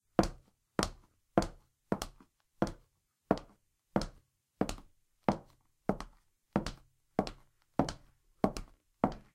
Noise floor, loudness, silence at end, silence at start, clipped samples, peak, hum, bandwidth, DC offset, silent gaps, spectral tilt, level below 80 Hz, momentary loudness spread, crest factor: -73 dBFS; -38 LUFS; 0.15 s; 0.2 s; under 0.1%; -8 dBFS; none; 16 kHz; under 0.1%; none; -6 dB/octave; -52 dBFS; 11 LU; 30 dB